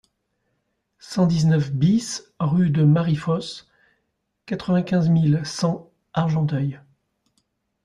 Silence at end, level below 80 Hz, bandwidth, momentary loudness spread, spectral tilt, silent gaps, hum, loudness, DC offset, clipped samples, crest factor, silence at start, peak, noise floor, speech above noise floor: 1.05 s; -56 dBFS; 11 kHz; 12 LU; -7 dB/octave; none; none; -21 LUFS; under 0.1%; under 0.1%; 16 dB; 1.05 s; -8 dBFS; -74 dBFS; 54 dB